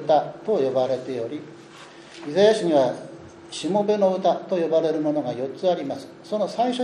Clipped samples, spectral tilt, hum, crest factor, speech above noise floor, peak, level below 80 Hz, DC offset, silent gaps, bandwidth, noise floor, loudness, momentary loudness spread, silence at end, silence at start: under 0.1%; -5.5 dB/octave; none; 16 dB; 22 dB; -6 dBFS; -70 dBFS; under 0.1%; none; 10.5 kHz; -44 dBFS; -23 LUFS; 20 LU; 0 s; 0 s